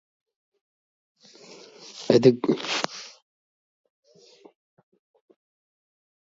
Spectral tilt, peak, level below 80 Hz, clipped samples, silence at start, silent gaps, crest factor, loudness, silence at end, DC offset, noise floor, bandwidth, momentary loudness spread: -5.5 dB/octave; -2 dBFS; -76 dBFS; under 0.1%; 1.95 s; none; 26 dB; -22 LUFS; 3.25 s; under 0.1%; -54 dBFS; 7.8 kHz; 28 LU